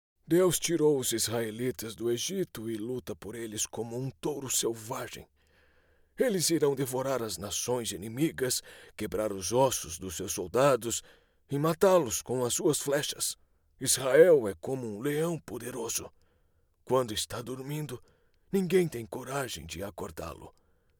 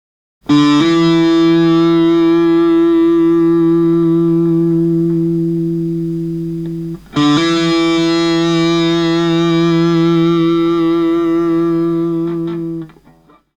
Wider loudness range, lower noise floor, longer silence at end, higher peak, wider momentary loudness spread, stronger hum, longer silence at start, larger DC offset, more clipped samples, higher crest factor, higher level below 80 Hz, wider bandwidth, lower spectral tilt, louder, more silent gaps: about the same, 7 LU vs 5 LU; first, -69 dBFS vs -47 dBFS; second, 0.5 s vs 0.7 s; second, -8 dBFS vs -2 dBFS; first, 13 LU vs 9 LU; neither; second, 0.3 s vs 0.5 s; neither; neither; first, 22 dB vs 10 dB; second, -60 dBFS vs -46 dBFS; first, over 20 kHz vs 8 kHz; second, -4 dB/octave vs -7 dB/octave; second, -30 LUFS vs -13 LUFS; neither